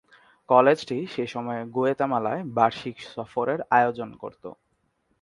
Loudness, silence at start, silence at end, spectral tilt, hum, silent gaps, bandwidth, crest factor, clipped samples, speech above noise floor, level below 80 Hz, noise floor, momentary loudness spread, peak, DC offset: -24 LUFS; 0.5 s; 0.7 s; -6.5 dB/octave; none; none; 11.5 kHz; 22 dB; under 0.1%; 46 dB; -68 dBFS; -71 dBFS; 17 LU; -4 dBFS; under 0.1%